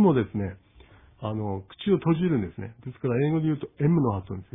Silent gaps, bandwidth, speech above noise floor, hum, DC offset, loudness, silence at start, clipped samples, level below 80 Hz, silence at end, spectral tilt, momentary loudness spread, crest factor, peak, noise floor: none; 3.9 kHz; 28 dB; none; under 0.1%; -27 LUFS; 0 s; under 0.1%; -56 dBFS; 0.1 s; -12 dB/octave; 12 LU; 16 dB; -10 dBFS; -53 dBFS